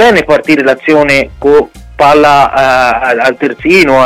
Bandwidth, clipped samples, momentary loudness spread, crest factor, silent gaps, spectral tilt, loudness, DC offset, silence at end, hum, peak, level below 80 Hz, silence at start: 16.5 kHz; 0.3%; 4 LU; 8 dB; none; -5 dB/octave; -7 LUFS; under 0.1%; 0 s; none; 0 dBFS; -34 dBFS; 0 s